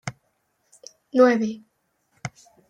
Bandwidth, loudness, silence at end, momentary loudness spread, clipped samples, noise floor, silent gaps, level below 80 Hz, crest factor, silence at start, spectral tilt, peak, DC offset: 9.6 kHz; -20 LUFS; 0.4 s; 20 LU; under 0.1%; -71 dBFS; none; -68 dBFS; 20 dB; 0.05 s; -6 dB/octave; -6 dBFS; under 0.1%